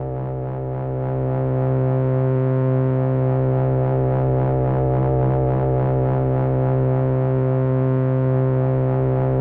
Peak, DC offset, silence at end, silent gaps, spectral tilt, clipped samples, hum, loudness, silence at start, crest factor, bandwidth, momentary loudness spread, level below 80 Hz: -10 dBFS; under 0.1%; 0 s; none; -13 dB/octave; under 0.1%; none; -20 LUFS; 0 s; 8 dB; 3 kHz; 4 LU; -36 dBFS